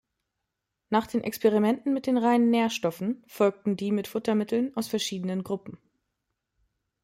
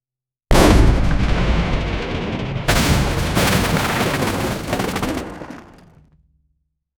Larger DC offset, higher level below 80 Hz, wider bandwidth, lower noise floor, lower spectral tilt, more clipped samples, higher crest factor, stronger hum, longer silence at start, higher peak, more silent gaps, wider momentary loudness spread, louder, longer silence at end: neither; second, -70 dBFS vs -22 dBFS; second, 16 kHz vs over 20 kHz; second, -83 dBFS vs -89 dBFS; about the same, -5.5 dB/octave vs -5 dB/octave; neither; about the same, 18 dB vs 18 dB; neither; first, 0.9 s vs 0.5 s; second, -10 dBFS vs 0 dBFS; neither; about the same, 9 LU vs 10 LU; second, -27 LUFS vs -18 LUFS; about the same, 1.3 s vs 1.35 s